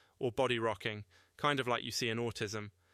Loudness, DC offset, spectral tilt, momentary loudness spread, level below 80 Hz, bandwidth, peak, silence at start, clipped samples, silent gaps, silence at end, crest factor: -36 LUFS; under 0.1%; -4 dB/octave; 8 LU; -68 dBFS; 15 kHz; -18 dBFS; 0.2 s; under 0.1%; none; 0.25 s; 20 dB